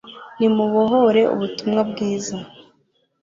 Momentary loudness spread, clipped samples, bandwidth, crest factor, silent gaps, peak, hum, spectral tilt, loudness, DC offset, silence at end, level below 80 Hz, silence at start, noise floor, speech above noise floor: 13 LU; under 0.1%; 7.6 kHz; 16 dB; none; -4 dBFS; none; -5.5 dB/octave; -19 LUFS; under 0.1%; 0.75 s; -62 dBFS; 0.05 s; -64 dBFS; 46 dB